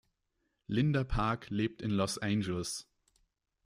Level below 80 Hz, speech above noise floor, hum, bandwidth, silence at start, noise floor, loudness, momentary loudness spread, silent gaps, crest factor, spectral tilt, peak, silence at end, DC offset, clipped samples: -50 dBFS; 49 dB; none; 14.5 kHz; 0.7 s; -81 dBFS; -34 LUFS; 6 LU; none; 16 dB; -5.5 dB/octave; -18 dBFS; 0.85 s; under 0.1%; under 0.1%